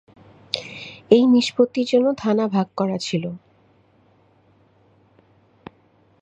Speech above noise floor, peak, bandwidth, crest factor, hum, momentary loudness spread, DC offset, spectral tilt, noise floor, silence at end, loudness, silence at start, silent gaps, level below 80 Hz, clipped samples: 39 dB; -2 dBFS; 8.4 kHz; 22 dB; none; 17 LU; under 0.1%; -6 dB/octave; -58 dBFS; 2.85 s; -20 LUFS; 0.55 s; none; -64 dBFS; under 0.1%